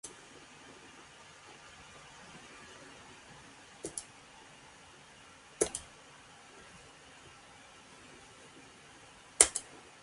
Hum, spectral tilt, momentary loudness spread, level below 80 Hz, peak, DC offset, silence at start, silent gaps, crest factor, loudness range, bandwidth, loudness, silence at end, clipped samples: none; -0.5 dB/octave; 20 LU; -66 dBFS; 0 dBFS; under 0.1%; 0.05 s; none; 42 dB; 18 LU; 11.5 kHz; -31 LUFS; 0 s; under 0.1%